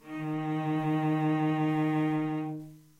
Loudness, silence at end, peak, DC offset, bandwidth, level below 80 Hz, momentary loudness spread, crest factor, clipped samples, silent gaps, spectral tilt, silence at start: -30 LUFS; 0.2 s; -18 dBFS; under 0.1%; 7.4 kHz; -72 dBFS; 7 LU; 12 dB; under 0.1%; none; -8.5 dB/octave; 0.05 s